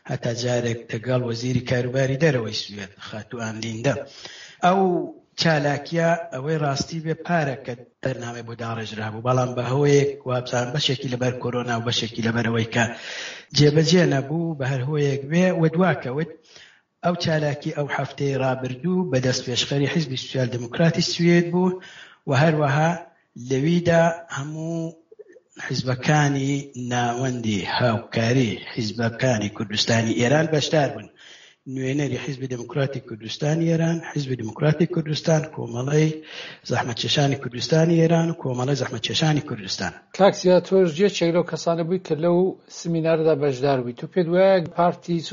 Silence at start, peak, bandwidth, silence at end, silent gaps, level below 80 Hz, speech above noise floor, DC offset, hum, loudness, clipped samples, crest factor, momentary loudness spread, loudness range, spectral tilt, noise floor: 0.05 s; -4 dBFS; 7.4 kHz; 0 s; none; -58 dBFS; 26 dB; under 0.1%; none; -22 LUFS; under 0.1%; 18 dB; 12 LU; 4 LU; -5 dB/octave; -48 dBFS